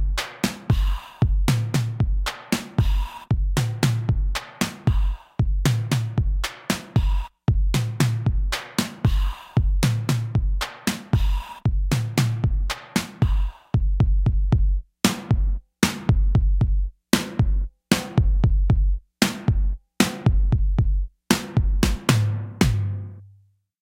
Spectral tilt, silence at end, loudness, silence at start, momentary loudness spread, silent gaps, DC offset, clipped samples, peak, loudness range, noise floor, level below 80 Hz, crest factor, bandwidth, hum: -5.5 dB/octave; 0.55 s; -24 LUFS; 0 s; 6 LU; none; under 0.1%; under 0.1%; 0 dBFS; 2 LU; -57 dBFS; -24 dBFS; 20 dB; 16.5 kHz; none